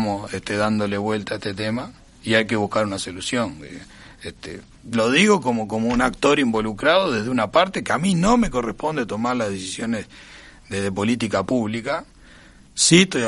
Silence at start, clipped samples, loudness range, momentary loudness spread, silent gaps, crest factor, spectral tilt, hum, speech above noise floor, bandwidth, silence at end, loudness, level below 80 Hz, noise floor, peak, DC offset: 0 s; under 0.1%; 6 LU; 17 LU; none; 20 dB; -4 dB/octave; none; 26 dB; 11.5 kHz; 0 s; -21 LUFS; -46 dBFS; -47 dBFS; -2 dBFS; under 0.1%